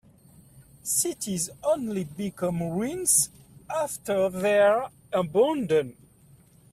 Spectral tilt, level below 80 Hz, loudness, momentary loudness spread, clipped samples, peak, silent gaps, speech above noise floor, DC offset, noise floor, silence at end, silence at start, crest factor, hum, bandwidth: -4 dB/octave; -62 dBFS; -25 LUFS; 10 LU; under 0.1%; -8 dBFS; none; 31 dB; under 0.1%; -56 dBFS; 0.8 s; 0.55 s; 18 dB; none; 15.5 kHz